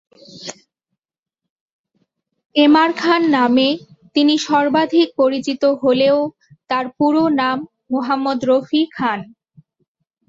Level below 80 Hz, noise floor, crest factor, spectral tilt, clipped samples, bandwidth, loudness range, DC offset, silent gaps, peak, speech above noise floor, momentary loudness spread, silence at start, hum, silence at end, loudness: -64 dBFS; -86 dBFS; 16 dB; -4.5 dB/octave; under 0.1%; 7.8 kHz; 4 LU; under 0.1%; 1.19-1.23 s, 1.50-1.84 s, 2.46-2.50 s; -2 dBFS; 71 dB; 12 LU; 0.35 s; none; 1.05 s; -16 LUFS